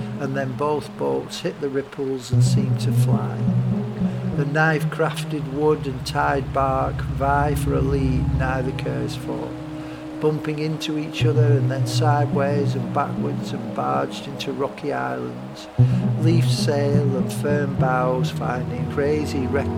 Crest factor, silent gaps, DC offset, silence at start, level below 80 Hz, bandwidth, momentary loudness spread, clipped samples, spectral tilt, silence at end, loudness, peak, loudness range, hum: 16 dB; none; under 0.1%; 0 s; -38 dBFS; 15 kHz; 9 LU; under 0.1%; -7 dB/octave; 0 s; -22 LUFS; -4 dBFS; 3 LU; none